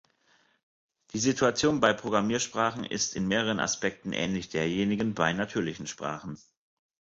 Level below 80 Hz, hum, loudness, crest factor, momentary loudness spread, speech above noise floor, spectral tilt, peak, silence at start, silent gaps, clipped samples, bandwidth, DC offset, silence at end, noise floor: -60 dBFS; none; -28 LUFS; 22 dB; 11 LU; 38 dB; -4 dB/octave; -8 dBFS; 1.15 s; none; under 0.1%; 8 kHz; under 0.1%; 0.8 s; -67 dBFS